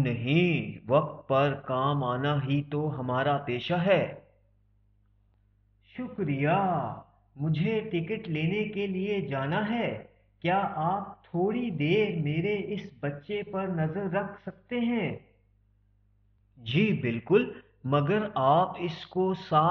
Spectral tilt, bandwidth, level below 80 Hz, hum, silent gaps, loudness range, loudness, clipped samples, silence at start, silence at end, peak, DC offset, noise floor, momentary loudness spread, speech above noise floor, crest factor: -5.5 dB/octave; 6.2 kHz; -62 dBFS; 50 Hz at -55 dBFS; none; 5 LU; -29 LUFS; under 0.1%; 0 s; 0 s; -10 dBFS; under 0.1%; -66 dBFS; 11 LU; 38 dB; 18 dB